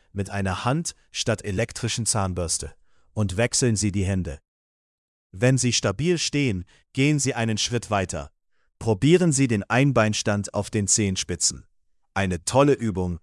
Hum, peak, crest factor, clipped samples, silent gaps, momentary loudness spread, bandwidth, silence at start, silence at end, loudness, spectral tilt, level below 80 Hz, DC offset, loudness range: none; -4 dBFS; 18 dB; under 0.1%; 4.48-5.30 s; 11 LU; 12 kHz; 0.15 s; 0.05 s; -23 LUFS; -4.5 dB/octave; -50 dBFS; under 0.1%; 4 LU